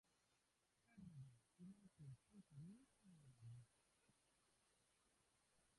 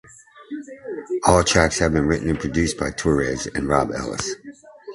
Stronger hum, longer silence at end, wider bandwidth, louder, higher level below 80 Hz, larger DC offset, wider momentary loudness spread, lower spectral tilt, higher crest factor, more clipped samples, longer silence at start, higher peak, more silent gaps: neither; about the same, 0 s vs 0 s; about the same, 11 kHz vs 11.5 kHz; second, -65 LUFS vs -21 LUFS; second, -88 dBFS vs -36 dBFS; neither; second, 4 LU vs 18 LU; first, -6.5 dB/octave vs -4.5 dB/octave; second, 14 dB vs 22 dB; neither; second, 0.05 s vs 0.35 s; second, -52 dBFS vs 0 dBFS; neither